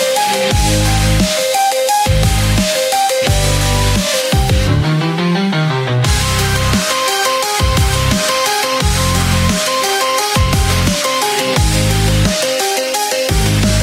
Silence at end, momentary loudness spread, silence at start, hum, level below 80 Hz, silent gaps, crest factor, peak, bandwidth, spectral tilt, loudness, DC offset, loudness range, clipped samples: 0 s; 2 LU; 0 s; none; -22 dBFS; none; 12 dB; 0 dBFS; 16.5 kHz; -4 dB/octave; -13 LUFS; under 0.1%; 1 LU; under 0.1%